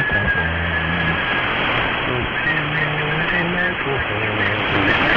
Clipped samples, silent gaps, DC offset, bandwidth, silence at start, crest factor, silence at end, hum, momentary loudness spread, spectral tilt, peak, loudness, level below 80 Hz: under 0.1%; none; under 0.1%; 7 kHz; 0 s; 18 dB; 0 s; none; 3 LU; -7 dB/octave; -2 dBFS; -18 LUFS; -36 dBFS